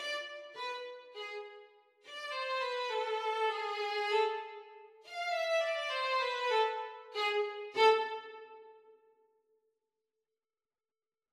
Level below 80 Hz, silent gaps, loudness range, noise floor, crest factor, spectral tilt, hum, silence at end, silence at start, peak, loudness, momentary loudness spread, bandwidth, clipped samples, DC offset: -88 dBFS; none; 6 LU; under -90 dBFS; 22 dB; 0 dB/octave; none; 2.4 s; 0 s; -16 dBFS; -34 LUFS; 16 LU; 13 kHz; under 0.1%; under 0.1%